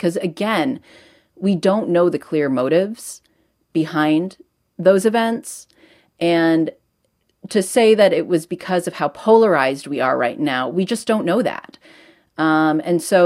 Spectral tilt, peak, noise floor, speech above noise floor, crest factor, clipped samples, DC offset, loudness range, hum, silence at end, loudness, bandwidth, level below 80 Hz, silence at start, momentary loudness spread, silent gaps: -5.5 dB/octave; 0 dBFS; -67 dBFS; 50 dB; 18 dB; under 0.1%; under 0.1%; 3 LU; none; 0 s; -18 LUFS; 16 kHz; -68 dBFS; 0 s; 11 LU; none